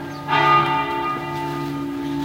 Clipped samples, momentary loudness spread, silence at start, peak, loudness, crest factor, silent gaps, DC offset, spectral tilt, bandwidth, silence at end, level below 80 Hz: under 0.1%; 11 LU; 0 s; -4 dBFS; -20 LUFS; 16 dB; none; under 0.1%; -5.5 dB/octave; 16 kHz; 0 s; -50 dBFS